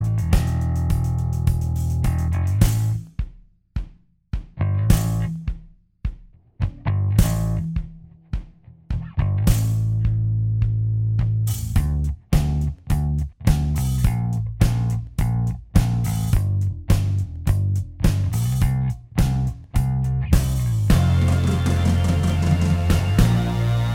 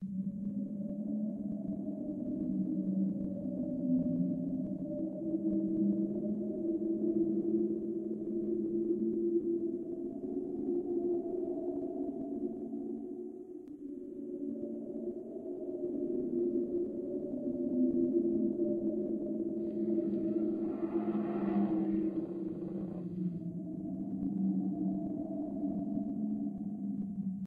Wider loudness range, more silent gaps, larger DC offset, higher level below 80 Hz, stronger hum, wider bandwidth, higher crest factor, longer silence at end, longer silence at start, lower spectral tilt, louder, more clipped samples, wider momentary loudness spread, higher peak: about the same, 6 LU vs 5 LU; neither; neither; first, -26 dBFS vs -66 dBFS; neither; first, 17 kHz vs 2.9 kHz; about the same, 18 dB vs 16 dB; about the same, 0 s vs 0 s; about the same, 0 s vs 0 s; second, -7 dB/octave vs -12 dB/octave; first, -22 LUFS vs -36 LUFS; neither; first, 12 LU vs 8 LU; first, -2 dBFS vs -20 dBFS